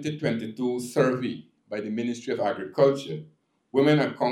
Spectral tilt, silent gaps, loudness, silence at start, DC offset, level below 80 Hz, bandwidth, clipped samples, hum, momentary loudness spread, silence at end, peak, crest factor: -6.5 dB/octave; none; -26 LUFS; 0 s; under 0.1%; -76 dBFS; 14.5 kHz; under 0.1%; none; 13 LU; 0 s; -8 dBFS; 18 dB